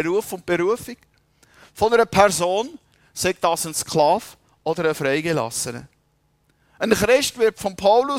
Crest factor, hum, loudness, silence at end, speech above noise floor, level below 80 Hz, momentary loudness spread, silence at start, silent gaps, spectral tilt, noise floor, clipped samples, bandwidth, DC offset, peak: 20 dB; none; -20 LUFS; 0 s; 44 dB; -52 dBFS; 12 LU; 0 s; none; -3.5 dB/octave; -64 dBFS; under 0.1%; 16 kHz; under 0.1%; -2 dBFS